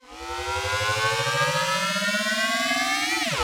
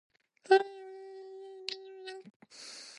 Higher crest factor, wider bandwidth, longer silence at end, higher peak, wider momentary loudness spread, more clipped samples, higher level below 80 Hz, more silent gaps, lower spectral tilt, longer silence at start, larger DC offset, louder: second, 14 dB vs 24 dB; first, over 20 kHz vs 11.5 kHz; about the same, 0 s vs 0 s; about the same, -10 dBFS vs -12 dBFS; second, 5 LU vs 22 LU; neither; first, -50 dBFS vs under -90 dBFS; second, none vs 2.36-2.40 s; about the same, -2 dB/octave vs -2.5 dB/octave; second, 0.05 s vs 0.45 s; neither; first, -23 LUFS vs -31 LUFS